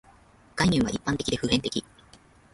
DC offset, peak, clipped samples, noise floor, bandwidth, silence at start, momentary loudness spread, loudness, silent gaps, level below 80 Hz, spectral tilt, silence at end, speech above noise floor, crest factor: under 0.1%; -8 dBFS; under 0.1%; -56 dBFS; 11.5 kHz; 0.55 s; 10 LU; -26 LUFS; none; -48 dBFS; -4.5 dB/octave; 0.75 s; 30 dB; 20 dB